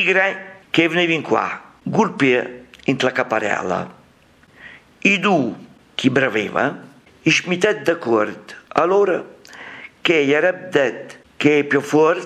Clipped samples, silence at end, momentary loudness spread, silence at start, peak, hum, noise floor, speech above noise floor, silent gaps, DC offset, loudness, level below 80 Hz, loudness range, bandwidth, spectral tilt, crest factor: under 0.1%; 0 s; 17 LU; 0 s; 0 dBFS; none; -52 dBFS; 34 dB; none; under 0.1%; -18 LUFS; -64 dBFS; 2 LU; 12.5 kHz; -5 dB/octave; 20 dB